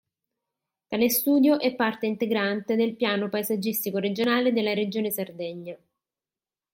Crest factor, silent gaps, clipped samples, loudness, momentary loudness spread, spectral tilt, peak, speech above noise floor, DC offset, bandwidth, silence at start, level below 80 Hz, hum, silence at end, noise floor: 18 dB; none; under 0.1%; -25 LUFS; 12 LU; -4.5 dB/octave; -8 dBFS; over 65 dB; under 0.1%; 16.5 kHz; 0.9 s; -74 dBFS; none; 0.95 s; under -90 dBFS